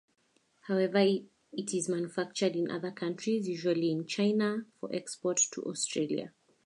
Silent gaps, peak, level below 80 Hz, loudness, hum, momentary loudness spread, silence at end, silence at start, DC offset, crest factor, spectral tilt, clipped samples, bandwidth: none; -14 dBFS; -82 dBFS; -32 LUFS; none; 10 LU; 0.35 s; 0.65 s; under 0.1%; 18 dB; -4 dB/octave; under 0.1%; 11.5 kHz